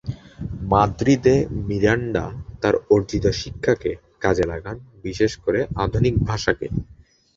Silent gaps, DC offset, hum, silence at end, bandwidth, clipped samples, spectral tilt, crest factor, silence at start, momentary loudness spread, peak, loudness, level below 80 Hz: none; under 0.1%; none; 0.45 s; 7.8 kHz; under 0.1%; -6.5 dB/octave; 20 dB; 0.05 s; 14 LU; -2 dBFS; -21 LUFS; -36 dBFS